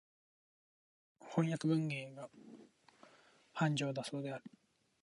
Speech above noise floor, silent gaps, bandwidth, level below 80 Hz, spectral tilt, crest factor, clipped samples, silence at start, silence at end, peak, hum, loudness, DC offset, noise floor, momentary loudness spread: 29 dB; none; 11 kHz; -86 dBFS; -6 dB/octave; 20 dB; under 0.1%; 1.2 s; 0.55 s; -20 dBFS; none; -38 LUFS; under 0.1%; -67 dBFS; 23 LU